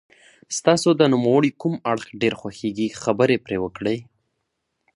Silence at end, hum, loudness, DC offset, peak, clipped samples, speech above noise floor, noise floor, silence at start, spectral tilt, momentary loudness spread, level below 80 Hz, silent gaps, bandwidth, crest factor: 0.9 s; none; -21 LUFS; under 0.1%; -2 dBFS; under 0.1%; 55 dB; -76 dBFS; 0.5 s; -5 dB/octave; 11 LU; -58 dBFS; none; 11.5 kHz; 20 dB